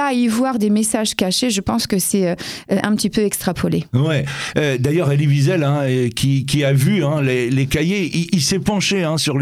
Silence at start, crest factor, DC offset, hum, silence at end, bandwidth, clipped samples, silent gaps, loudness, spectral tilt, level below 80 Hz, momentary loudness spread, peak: 0 s; 16 dB; under 0.1%; none; 0 s; 15.5 kHz; under 0.1%; none; -17 LUFS; -5 dB/octave; -46 dBFS; 4 LU; 0 dBFS